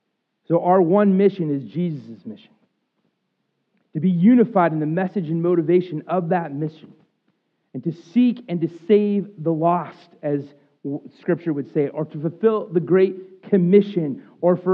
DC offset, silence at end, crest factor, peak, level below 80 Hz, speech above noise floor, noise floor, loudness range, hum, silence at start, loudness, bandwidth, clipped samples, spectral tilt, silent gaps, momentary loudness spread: under 0.1%; 0 s; 18 dB; -2 dBFS; -88 dBFS; 53 dB; -73 dBFS; 5 LU; none; 0.5 s; -20 LUFS; 5.2 kHz; under 0.1%; -10.5 dB/octave; none; 15 LU